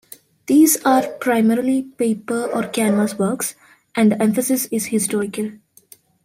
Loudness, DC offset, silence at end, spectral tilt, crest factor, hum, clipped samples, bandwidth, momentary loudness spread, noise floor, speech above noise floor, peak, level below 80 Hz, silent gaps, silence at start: -18 LUFS; under 0.1%; 0.7 s; -4.5 dB/octave; 16 dB; none; under 0.1%; 16 kHz; 11 LU; -50 dBFS; 32 dB; -4 dBFS; -64 dBFS; none; 0.5 s